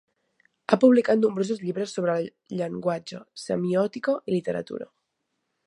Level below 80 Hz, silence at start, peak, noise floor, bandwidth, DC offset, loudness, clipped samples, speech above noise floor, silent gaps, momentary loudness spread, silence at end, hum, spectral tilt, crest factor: -72 dBFS; 0.7 s; -2 dBFS; -78 dBFS; 11 kHz; under 0.1%; -25 LUFS; under 0.1%; 54 dB; none; 19 LU; 0.8 s; none; -6.5 dB/octave; 24 dB